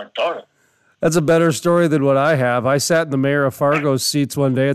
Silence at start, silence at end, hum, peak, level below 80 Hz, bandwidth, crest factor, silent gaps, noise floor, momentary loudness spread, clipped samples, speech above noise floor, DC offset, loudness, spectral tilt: 0 s; 0 s; none; -4 dBFS; -58 dBFS; 14 kHz; 14 dB; none; -60 dBFS; 7 LU; under 0.1%; 43 dB; under 0.1%; -17 LUFS; -5 dB/octave